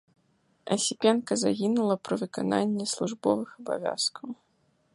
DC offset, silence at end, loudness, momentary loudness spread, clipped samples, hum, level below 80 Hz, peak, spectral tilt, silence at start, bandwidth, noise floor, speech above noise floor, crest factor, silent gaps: under 0.1%; 0.6 s; -28 LUFS; 9 LU; under 0.1%; none; -72 dBFS; -10 dBFS; -4 dB/octave; 0.65 s; 11.5 kHz; -69 dBFS; 41 dB; 20 dB; none